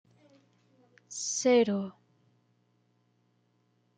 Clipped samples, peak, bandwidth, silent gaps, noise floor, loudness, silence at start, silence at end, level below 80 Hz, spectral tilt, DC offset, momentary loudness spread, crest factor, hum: under 0.1%; -14 dBFS; 9.4 kHz; none; -72 dBFS; -28 LUFS; 1.1 s; 2.05 s; -84 dBFS; -3.5 dB/octave; under 0.1%; 18 LU; 20 dB; 60 Hz at -55 dBFS